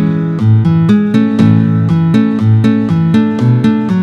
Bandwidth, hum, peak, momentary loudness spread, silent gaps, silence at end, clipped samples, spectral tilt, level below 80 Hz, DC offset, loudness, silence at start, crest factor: 7 kHz; none; 0 dBFS; 2 LU; none; 0 s; 0.1%; -9.5 dB/octave; -46 dBFS; under 0.1%; -10 LUFS; 0 s; 10 dB